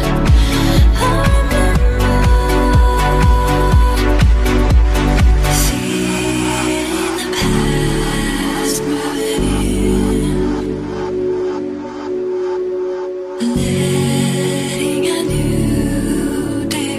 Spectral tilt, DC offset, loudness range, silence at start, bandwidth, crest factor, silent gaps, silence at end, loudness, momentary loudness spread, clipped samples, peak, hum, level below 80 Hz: -5.5 dB/octave; under 0.1%; 5 LU; 0 s; 15 kHz; 14 dB; none; 0 s; -16 LUFS; 7 LU; under 0.1%; 0 dBFS; none; -18 dBFS